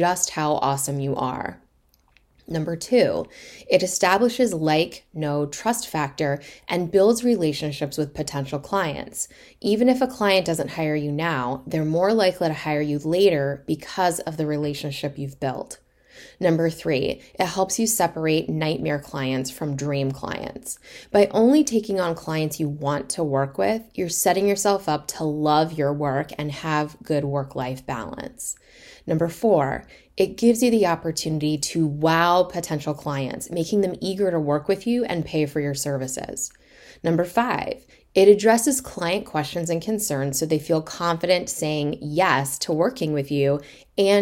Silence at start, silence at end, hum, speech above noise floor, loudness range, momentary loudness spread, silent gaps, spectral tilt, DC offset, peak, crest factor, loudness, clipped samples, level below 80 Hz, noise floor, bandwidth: 0 s; 0 s; none; 39 dB; 4 LU; 11 LU; none; -4.5 dB/octave; under 0.1%; -2 dBFS; 20 dB; -23 LUFS; under 0.1%; -54 dBFS; -62 dBFS; 16.5 kHz